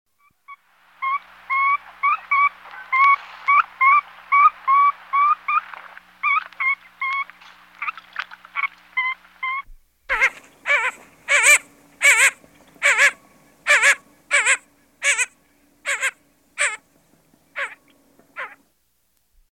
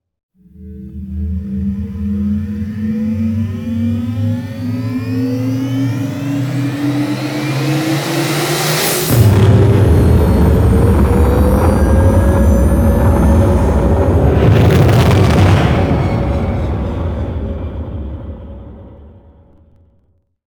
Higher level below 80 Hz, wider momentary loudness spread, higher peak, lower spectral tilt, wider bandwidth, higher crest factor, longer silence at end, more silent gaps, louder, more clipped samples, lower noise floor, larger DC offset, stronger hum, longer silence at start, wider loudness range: second, -60 dBFS vs -20 dBFS; first, 17 LU vs 12 LU; about the same, -2 dBFS vs 0 dBFS; second, 2.5 dB/octave vs -6.5 dB/octave; second, 16 kHz vs over 20 kHz; first, 20 dB vs 12 dB; second, 1.1 s vs 1.5 s; neither; second, -19 LUFS vs -13 LUFS; neither; first, -68 dBFS vs -57 dBFS; neither; neither; about the same, 0.5 s vs 0.6 s; about the same, 10 LU vs 10 LU